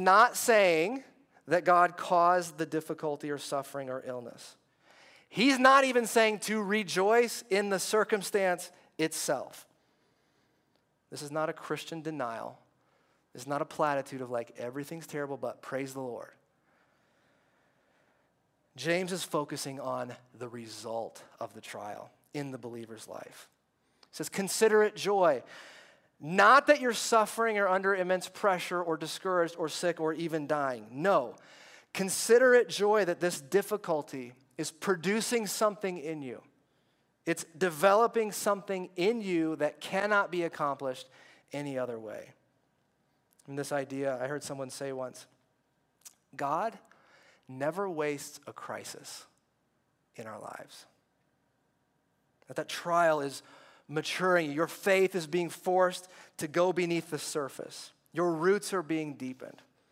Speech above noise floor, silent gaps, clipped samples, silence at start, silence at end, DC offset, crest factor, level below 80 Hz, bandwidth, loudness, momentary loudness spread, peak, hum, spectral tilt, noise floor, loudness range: 45 dB; none; under 0.1%; 0 s; 0.4 s; under 0.1%; 22 dB; -86 dBFS; 16 kHz; -30 LUFS; 19 LU; -10 dBFS; none; -4 dB/octave; -75 dBFS; 14 LU